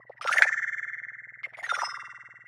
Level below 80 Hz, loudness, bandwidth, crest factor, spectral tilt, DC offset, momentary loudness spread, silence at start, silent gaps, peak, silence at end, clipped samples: under -90 dBFS; -27 LUFS; 15.5 kHz; 30 dB; 1.5 dB/octave; under 0.1%; 19 LU; 0.2 s; none; 0 dBFS; 0.05 s; under 0.1%